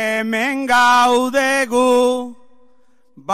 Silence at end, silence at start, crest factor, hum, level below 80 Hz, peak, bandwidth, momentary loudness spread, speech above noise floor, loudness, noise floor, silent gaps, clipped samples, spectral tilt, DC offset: 0 s; 0 s; 12 dB; none; -56 dBFS; -4 dBFS; 16 kHz; 11 LU; 42 dB; -15 LUFS; -58 dBFS; none; under 0.1%; -2.5 dB/octave; under 0.1%